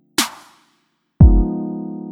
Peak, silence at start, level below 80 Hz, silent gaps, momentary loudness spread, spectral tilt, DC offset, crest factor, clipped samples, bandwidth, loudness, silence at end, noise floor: 0 dBFS; 0.2 s; -20 dBFS; none; 14 LU; -5.5 dB/octave; under 0.1%; 16 dB; under 0.1%; 17 kHz; -17 LUFS; 0 s; -65 dBFS